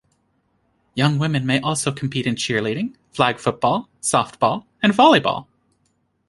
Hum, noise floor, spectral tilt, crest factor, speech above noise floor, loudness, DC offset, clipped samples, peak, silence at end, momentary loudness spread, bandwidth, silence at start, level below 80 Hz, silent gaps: none; -67 dBFS; -4.5 dB/octave; 20 dB; 48 dB; -20 LUFS; under 0.1%; under 0.1%; -2 dBFS; 0.85 s; 11 LU; 11.5 kHz; 0.95 s; -58 dBFS; none